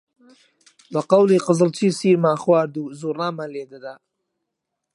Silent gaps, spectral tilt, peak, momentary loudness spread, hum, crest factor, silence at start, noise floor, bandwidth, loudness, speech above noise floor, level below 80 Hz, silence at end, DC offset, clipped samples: none; -6.5 dB/octave; -2 dBFS; 17 LU; none; 20 dB; 0.9 s; -80 dBFS; 11.5 kHz; -19 LUFS; 61 dB; -72 dBFS; 1 s; under 0.1%; under 0.1%